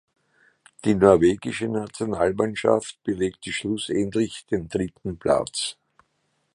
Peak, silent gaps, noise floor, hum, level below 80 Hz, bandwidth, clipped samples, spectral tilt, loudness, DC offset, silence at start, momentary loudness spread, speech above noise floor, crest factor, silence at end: 0 dBFS; none; -71 dBFS; none; -50 dBFS; 11.5 kHz; under 0.1%; -5 dB/octave; -24 LUFS; under 0.1%; 0.85 s; 11 LU; 49 dB; 24 dB; 0.85 s